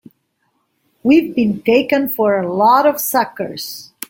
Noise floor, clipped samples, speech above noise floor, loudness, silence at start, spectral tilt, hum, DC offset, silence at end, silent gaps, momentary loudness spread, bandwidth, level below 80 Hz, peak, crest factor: -66 dBFS; under 0.1%; 51 dB; -15 LUFS; 1.05 s; -4.5 dB/octave; none; under 0.1%; 0.25 s; none; 12 LU; 17 kHz; -58 dBFS; -2 dBFS; 14 dB